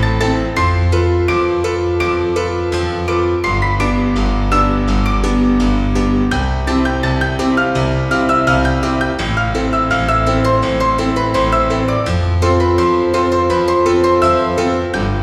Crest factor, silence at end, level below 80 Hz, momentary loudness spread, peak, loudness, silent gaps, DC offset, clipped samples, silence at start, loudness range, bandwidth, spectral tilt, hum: 14 dB; 0 s; -22 dBFS; 4 LU; -2 dBFS; -15 LUFS; none; under 0.1%; under 0.1%; 0 s; 2 LU; 12.5 kHz; -6.5 dB/octave; none